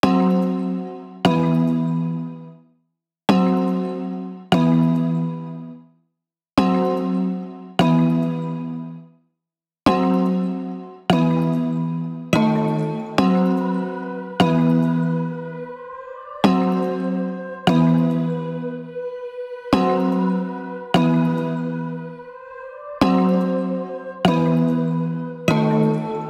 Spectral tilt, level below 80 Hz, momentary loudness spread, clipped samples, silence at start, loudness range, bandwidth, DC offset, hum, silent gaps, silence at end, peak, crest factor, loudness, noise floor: -7.5 dB/octave; -54 dBFS; 14 LU; under 0.1%; 0.05 s; 2 LU; 11.5 kHz; under 0.1%; none; none; 0 s; -2 dBFS; 18 dB; -20 LUFS; -86 dBFS